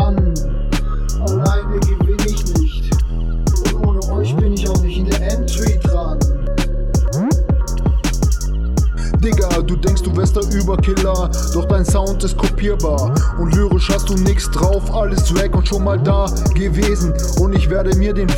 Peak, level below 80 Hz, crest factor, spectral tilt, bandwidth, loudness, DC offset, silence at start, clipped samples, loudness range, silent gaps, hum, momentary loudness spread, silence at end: -2 dBFS; -16 dBFS; 12 dB; -6 dB/octave; 16.5 kHz; -17 LUFS; 0.3%; 0 s; under 0.1%; 2 LU; none; none; 3 LU; 0 s